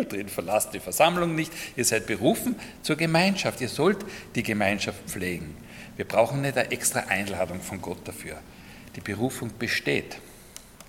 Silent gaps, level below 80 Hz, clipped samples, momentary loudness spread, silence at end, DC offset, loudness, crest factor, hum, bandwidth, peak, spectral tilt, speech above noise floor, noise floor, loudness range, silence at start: none; -56 dBFS; under 0.1%; 19 LU; 0 s; under 0.1%; -26 LUFS; 22 dB; none; 17.5 kHz; -6 dBFS; -4 dB/octave; 20 dB; -47 dBFS; 5 LU; 0 s